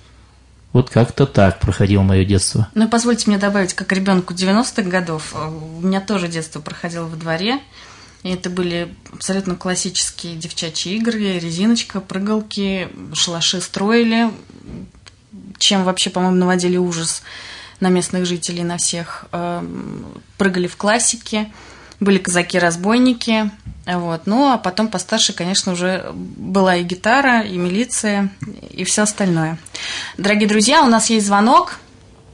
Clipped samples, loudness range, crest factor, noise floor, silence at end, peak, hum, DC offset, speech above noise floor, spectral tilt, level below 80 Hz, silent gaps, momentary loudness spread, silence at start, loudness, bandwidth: under 0.1%; 6 LU; 16 dB; -47 dBFS; 0.55 s; -2 dBFS; none; under 0.1%; 29 dB; -4 dB/octave; -46 dBFS; none; 12 LU; 0.75 s; -17 LUFS; 11 kHz